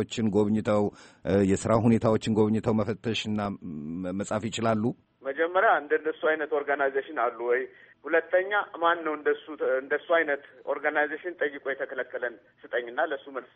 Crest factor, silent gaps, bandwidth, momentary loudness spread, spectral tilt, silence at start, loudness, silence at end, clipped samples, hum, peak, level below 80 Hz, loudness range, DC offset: 18 dB; none; 8.4 kHz; 10 LU; -6 dB/octave; 0 s; -27 LUFS; 0.1 s; under 0.1%; none; -8 dBFS; -60 dBFS; 3 LU; under 0.1%